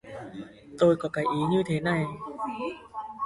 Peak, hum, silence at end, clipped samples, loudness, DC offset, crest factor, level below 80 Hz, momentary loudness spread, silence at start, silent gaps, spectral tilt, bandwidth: -10 dBFS; none; 0 s; under 0.1%; -27 LUFS; under 0.1%; 18 dB; -60 dBFS; 18 LU; 0.05 s; none; -7 dB/octave; 11.5 kHz